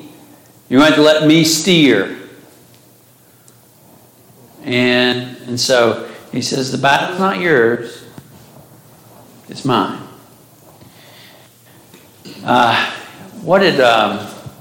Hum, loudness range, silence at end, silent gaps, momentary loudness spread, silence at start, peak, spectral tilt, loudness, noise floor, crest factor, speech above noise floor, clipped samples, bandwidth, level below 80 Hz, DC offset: none; 11 LU; 0.1 s; none; 19 LU; 0 s; 0 dBFS; -4 dB/octave; -14 LUFS; -48 dBFS; 16 dB; 35 dB; under 0.1%; 17 kHz; -58 dBFS; under 0.1%